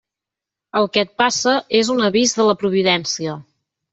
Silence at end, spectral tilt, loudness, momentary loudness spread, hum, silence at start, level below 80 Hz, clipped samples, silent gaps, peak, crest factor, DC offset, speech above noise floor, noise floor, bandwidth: 0.5 s; -3 dB/octave; -17 LUFS; 9 LU; none; 0.75 s; -62 dBFS; under 0.1%; none; -2 dBFS; 16 dB; under 0.1%; 68 dB; -86 dBFS; 8.2 kHz